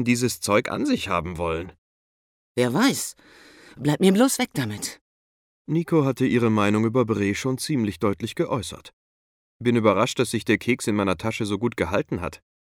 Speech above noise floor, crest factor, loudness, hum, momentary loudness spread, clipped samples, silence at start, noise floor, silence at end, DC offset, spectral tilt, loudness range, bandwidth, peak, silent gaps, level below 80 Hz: over 67 dB; 18 dB; -23 LUFS; none; 10 LU; under 0.1%; 0 s; under -90 dBFS; 0.35 s; under 0.1%; -5 dB/octave; 2 LU; 17.5 kHz; -6 dBFS; 1.78-2.55 s, 5.01-5.65 s, 8.93-9.60 s; -56 dBFS